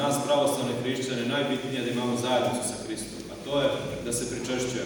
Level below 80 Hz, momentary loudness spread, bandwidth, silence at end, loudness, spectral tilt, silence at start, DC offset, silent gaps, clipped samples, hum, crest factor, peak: -56 dBFS; 9 LU; 19.5 kHz; 0 s; -28 LUFS; -4 dB/octave; 0 s; under 0.1%; none; under 0.1%; none; 16 dB; -12 dBFS